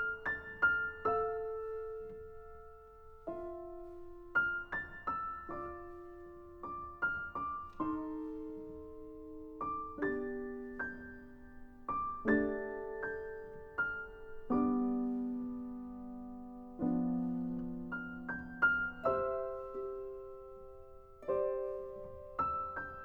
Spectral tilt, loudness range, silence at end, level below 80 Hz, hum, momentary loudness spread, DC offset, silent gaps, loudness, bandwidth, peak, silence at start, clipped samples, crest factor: -8.5 dB/octave; 5 LU; 0 s; -58 dBFS; none; 18 LU; under 0.1%; none; -38 LUFS; 5.8 kHz; -18 dBFS; 0 s; under 0.1%; 20 dB